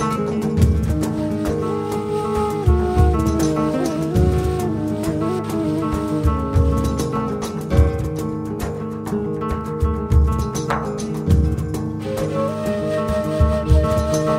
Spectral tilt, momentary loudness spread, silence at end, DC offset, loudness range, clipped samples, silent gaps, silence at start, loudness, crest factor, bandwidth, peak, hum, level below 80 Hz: -7.5 dB/octave; 7 LU; 0 s; under 0.1%; 2 LU; under 0.1%; none; 0 s; -20 LUFS; 16 dB; 15 kHz; -2 dBFS; none; -24 dBFS